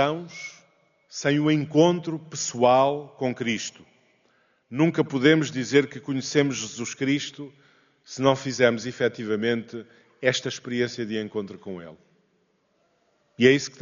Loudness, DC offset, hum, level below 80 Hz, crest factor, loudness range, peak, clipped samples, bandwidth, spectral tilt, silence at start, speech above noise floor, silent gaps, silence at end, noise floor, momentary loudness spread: -24 LUFS; under 0.1%; none; -70 dBFS; 22 dB; 5 LU; -4 dBFS; under 0.1%; 7.4 kHz; -4.5 dB/octave; 0 s; 44 dB; none; 0.1 s; -68 dBFS; 18 LU